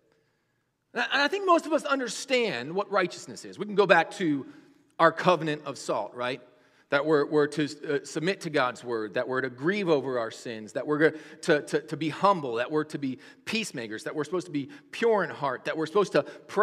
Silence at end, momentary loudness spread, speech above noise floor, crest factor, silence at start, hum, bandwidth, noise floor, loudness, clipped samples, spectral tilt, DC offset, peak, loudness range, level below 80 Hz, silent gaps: 0 s; 11 LU; 48 dB; 26 dB; 0.95 s; none; 14 kHz; -75 dBFS; -27 LUFS; under 0.1%; -4.5 dB/octave; under 0.1%; -2 dBFS; 3 LU; -80 dBFS; none